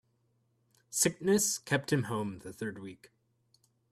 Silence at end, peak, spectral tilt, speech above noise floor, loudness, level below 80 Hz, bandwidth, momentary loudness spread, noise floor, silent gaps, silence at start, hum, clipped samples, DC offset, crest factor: 0.85 s; -14 dBFS; -3.5 dB/octave; 42 dB; -31 LUFS; -70 dBFS; 15.5 kHz; 13 LU; -74 dBFS; none; 0.9 s; none; under 0.1%; under 0.1%; 20 dB